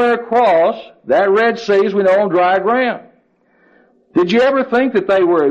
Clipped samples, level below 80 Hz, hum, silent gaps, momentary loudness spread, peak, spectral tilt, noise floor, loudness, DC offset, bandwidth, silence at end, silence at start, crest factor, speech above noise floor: under 0.1%; -58 dBFS; none; none; 5 LU; -4 dBFS; -6 dB/octave; -56 dBFS; -14 LUFS; under 0.1%; 8 kHz; 0 s; 0 s; 10 dB; 42 dB